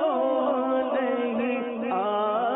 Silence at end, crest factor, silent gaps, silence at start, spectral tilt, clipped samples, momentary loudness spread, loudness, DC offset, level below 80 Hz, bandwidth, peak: 0 s; 10 dB; none; 0 s; -9.5 dB/octave; under 0.1%; 4 LU; -26 LUFS; under 0.1%; -72 dBFS; 4 kHz; -14 dBFS